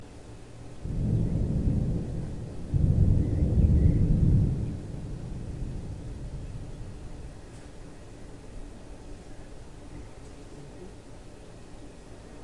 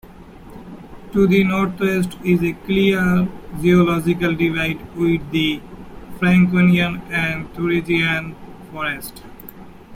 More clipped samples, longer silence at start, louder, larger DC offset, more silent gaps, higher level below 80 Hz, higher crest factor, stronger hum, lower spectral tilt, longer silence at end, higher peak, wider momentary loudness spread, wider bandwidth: neither; about the same, 0 s vs 0.05 s; second, -28 LUFS vs -18 LUFS; first, 0.3% vs under 0.1%; neither; first, -34 dBFS vs -42 dBFS; about the same, 18 dB vs 16 dB; neither; first, -9 dB/octave vs -7 dB/octave; about the same, 0 s vs 0 s; second, -10 dBFS vs -2 dBFS; about the same, 23 LU vs 23 LU; second, 11 kHz vs 16 kHz